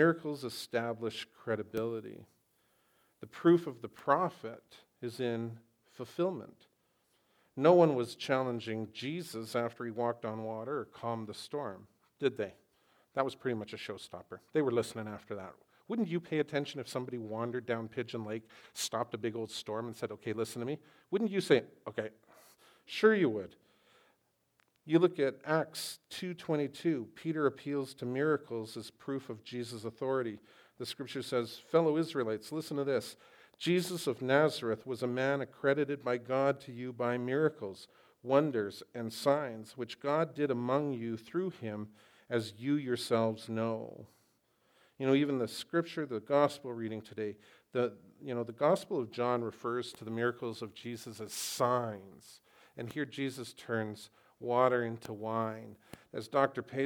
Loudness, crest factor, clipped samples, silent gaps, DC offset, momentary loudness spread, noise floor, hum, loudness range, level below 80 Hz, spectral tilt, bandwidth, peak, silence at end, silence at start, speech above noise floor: -35 LUFS; 24 dB; under 0.1%; none; under 0.1%; 15 LU; -75 dBFS; none; 6 LU; -82 dBFS; -5.5 dB/octave; 19 kHz; -12 dBFS; 0 s; 0 s; 41 dB